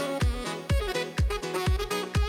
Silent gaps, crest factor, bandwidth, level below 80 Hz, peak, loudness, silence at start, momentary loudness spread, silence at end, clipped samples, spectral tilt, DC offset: none; 12 dB; 16.5 kHz; -32 dBFS; -16 dBFS; -29 LUFS; 0 s; 2 LU; 0 s; under 0.1%; -5 dB/octave; under 0.1%